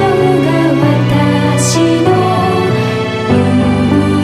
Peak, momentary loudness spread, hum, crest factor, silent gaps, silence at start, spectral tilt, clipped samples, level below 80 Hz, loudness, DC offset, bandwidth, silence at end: 0 dBFS; 3 LU; none; 10 dB; none; 0 s; -6 dB/octave; under 0.1%; -36 dBFS; -11 LUFS; under 0.1%; 14.5 kHz; 0 s